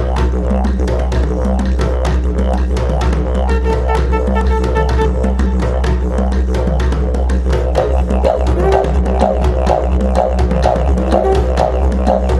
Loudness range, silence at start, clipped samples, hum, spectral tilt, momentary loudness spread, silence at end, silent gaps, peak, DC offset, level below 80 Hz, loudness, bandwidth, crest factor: 2 LU; 0 s; under 0.1%; none; -7.5 dB/octave; 3 LU; 0 s; none; 0 dBFS; under 0.1%; -14 dBFS; -15 LUFS; 9 kHz; 12 dB